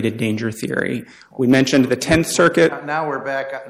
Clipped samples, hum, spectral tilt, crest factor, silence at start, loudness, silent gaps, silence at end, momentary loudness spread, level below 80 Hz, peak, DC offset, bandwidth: under 0.1%; none; -5 dB/octave; 14 dB; 0 s; -18 LUFS; none; 0 s; 10 LU; -46 dBFS; -4 dBFS; under 0.1%; 16 kHz